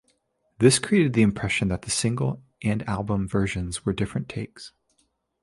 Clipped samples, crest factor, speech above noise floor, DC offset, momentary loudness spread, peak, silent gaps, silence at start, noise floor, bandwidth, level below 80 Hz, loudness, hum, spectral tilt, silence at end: under 0.1%; 22 dB; 46 dB; under 0.1%; 14 LU; -4 dBFS; none; 0.6 s; -70 dBFS; 11.5 kHz; -46 dBFS; -24 LUFS; none; -5 dB/octave; 0.75 s